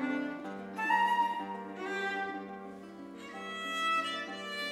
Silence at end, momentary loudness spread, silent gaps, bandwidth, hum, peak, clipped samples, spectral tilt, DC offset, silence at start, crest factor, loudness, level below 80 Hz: 0 s; 17 LU; none; 15 kHz; none; -18 dBFS; under 0.1%; -3.5 dB/octave; under 0.1%; 0 s; 18 dB; -34 LUFS; -78 dBFS